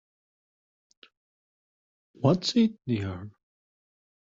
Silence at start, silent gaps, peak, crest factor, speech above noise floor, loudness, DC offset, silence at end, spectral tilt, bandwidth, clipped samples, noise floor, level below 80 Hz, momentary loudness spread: 2.2 s; none; -8 dBFS; 22 dB; over 64 dB; -27 LUFS; under 0.1%; 1.05 s; -6 dB/octave; 7.8 kHz; under 0.1%; under -90 dBFS; -68 dBFS; 17 LU